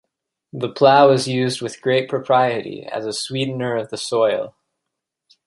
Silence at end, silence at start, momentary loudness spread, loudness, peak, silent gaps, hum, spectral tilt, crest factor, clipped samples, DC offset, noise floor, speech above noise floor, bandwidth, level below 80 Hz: 0.95 s; 0.55 s; 15 LU; -19 LUFS; -2 dBFS; none; none; -5 dB/octave; 18 dB; under 0.1%; under 0.1%; -81 dBFS; 62 dB; 11.5 kHz; -66 dBFS